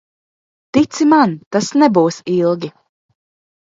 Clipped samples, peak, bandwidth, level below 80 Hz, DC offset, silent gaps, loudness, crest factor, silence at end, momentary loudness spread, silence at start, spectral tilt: under 0.1%; 0 dBFS; 7.8 kHz; -58 dBFS; under 0.1%; 1.46-1.51 s; -15 LUFS; 16 dB; 1.1 s; 8 LU; 0.75 s; -5.5 dB/octave